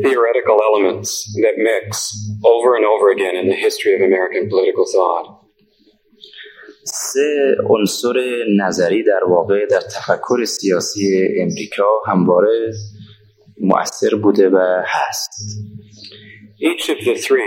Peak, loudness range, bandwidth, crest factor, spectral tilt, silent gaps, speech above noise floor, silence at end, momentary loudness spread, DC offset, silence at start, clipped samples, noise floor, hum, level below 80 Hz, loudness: 0 dBFS; 4 LU; 16.5 kHz; 16 dB; -4.5 dB/octave; none; 40 dB; 0 s; 12 LU; under 0.1%; 0 s; under 0.1%; -55 dBFS; none; -64 dBFS; -16 LUFS